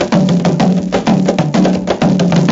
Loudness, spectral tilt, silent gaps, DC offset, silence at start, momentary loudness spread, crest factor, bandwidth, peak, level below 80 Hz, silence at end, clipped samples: -12 LUFS; -7 dB/octave; none; under 0.1%; 0 s; 2 LU; 12 dB; 7.8 kHz; 0 dBFS; -40 dBFS; 0 s; under 0.1%